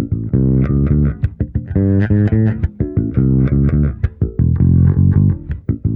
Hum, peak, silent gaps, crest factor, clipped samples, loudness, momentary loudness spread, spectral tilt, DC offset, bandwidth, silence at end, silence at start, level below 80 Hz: none; -2 dBFS; none; 12 dB; under 0.1%; -15 LUFS; 8 LU; -12.5 dB/octave; under 0.1%; 3.4 kHz; 0 s; 0 s; -24 dBFS